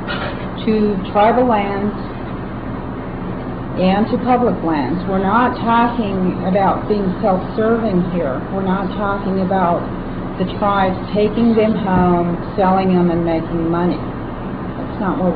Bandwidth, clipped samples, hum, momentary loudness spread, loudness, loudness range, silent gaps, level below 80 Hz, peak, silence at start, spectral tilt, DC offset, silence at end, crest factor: 4.9 kHz; under 0.1%; none; 11 LU; -17 LUFS; 3 LU; none; -34 dBFS; -2 dBFS; 0 s; -11 dB/octave; 0.2%; 0 s; 14 dB